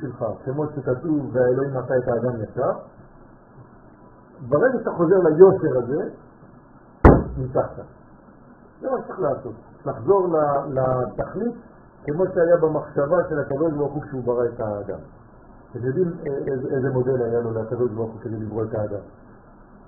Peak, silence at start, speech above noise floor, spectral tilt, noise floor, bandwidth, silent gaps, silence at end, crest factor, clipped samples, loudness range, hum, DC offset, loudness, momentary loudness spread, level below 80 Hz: 0 dBFS; 0 s; 26 dB; -5.5 dB/octave; -48 dBFS; 2.1 kHz; none; 0.1 s; 22 dB; under 0.1%; 7 LU; none; under 0.1%; -22 LUFS; 14 LU; -36 dBFS